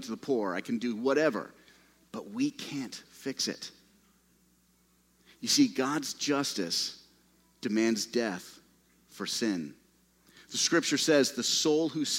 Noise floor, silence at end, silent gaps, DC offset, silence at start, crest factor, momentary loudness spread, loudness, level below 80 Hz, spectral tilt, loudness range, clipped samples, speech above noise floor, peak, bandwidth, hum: -67 dBFS; 0 s; none; under 0.1%; 0 s; 20 dB; 17 LU; -30 LUFS; -76 dBFS; -2.5 dB/octave; 8 LU; under 0.1%; 37 dB; -12 dBFS; 16 kHz; 60 Hz at -70 dBFS